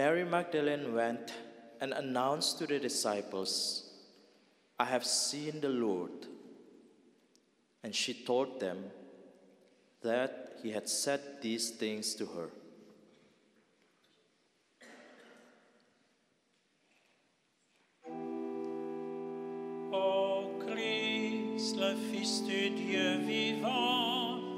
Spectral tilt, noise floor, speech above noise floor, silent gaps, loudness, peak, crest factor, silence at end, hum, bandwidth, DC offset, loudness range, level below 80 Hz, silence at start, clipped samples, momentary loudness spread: -3 dB/octave; -75 dBFS; 40 dB; none; -35 LUFS; -14 dBFS; 24 dB; 0 s; none; 16 kHz; under 0.1%; 11 LU; -88 dBFS; 0 s; under 0.1%; 14 LU